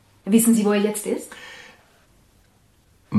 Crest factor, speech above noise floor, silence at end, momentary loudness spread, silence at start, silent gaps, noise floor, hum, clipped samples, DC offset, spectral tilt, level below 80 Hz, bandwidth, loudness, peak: 20 dB; 39 dB; 0 s; 23 LU; 0.25 s; none; -58 dBFS; none; under 0.1%; under 0.1%; -5 dB/octave; -64 dBFS; 15 kHz; -20 LUFS; -4 dBFS